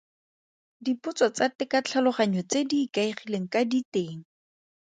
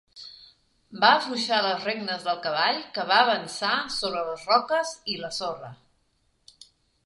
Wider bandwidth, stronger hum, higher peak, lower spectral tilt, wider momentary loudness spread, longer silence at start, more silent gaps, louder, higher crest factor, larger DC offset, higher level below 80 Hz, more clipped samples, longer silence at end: second, 9.4 kHz vs 11.5 kHz; neither; second, -10 dBFS vs -2 dBFS; first, -4.5 dB/octave vs -2.5 dB/octave; second, 8 LU vs 18 LU; first, 0.8 s vs 0.15 s; first, 1.55-1.59 s, 3.85-3.92 s vs none; about the same, -27 LUFS vs -25 LUFS; second, 18 dB vs 24 dB; neither; second, -74 dBFS vs -68 dBFS; neither; second, 0.65 s vs 1.3 s